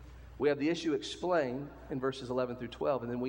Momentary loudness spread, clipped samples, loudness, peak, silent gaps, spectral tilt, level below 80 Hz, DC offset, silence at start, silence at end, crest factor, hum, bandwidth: 7 LU; under 0.1%; -34 LUFS; -16 dBFS; none; -5.5 dB/octave; -58 dBFS; under 0.1%; 0 s; 0 s; 18 dB; none; 16.5 kHz